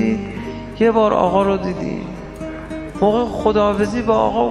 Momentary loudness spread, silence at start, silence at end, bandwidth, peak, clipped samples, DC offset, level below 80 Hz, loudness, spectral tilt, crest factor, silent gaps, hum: 15 LU; 0 s; 0 s; 11.5 kHz; -2 dBFS; under 0.1%; under 0.1%; -38 dBFS; -18 LUFS; -7 dB/octave; 16 dB; none; none